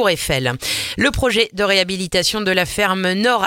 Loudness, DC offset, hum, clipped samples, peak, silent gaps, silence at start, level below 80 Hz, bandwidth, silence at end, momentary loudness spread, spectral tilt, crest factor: -17 LUFS; under 0.1%; none; under 0.1%; 0 dBFS; none; 0 s; -38 dBFS; 17 kHz; 0 s; 3 LU; -3.5 dB/octave; 18 dB